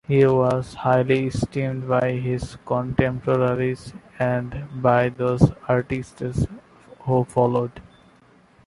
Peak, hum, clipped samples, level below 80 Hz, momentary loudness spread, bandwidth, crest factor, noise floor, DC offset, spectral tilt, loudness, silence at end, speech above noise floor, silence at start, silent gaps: -2 dBFS; none; under 0.1%; -44 dBFS; 10 LU; 11.5 kHz; 20 dB; -54 dBFS; under 0.1%; -8 dB/octave; -22 LUFS; 0.85 s; 33 dB; 0.1 s; none